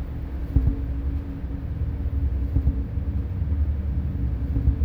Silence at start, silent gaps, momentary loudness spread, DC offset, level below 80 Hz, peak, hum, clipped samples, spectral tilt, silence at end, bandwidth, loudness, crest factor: 0 s; none; 7 LU; under 0.1%; -26 dBFS; -6 dBFS; none; under 0.1%; -10.5 dB/octave; 0 s; 3.4 kHz; -27 LUFS; 18 dB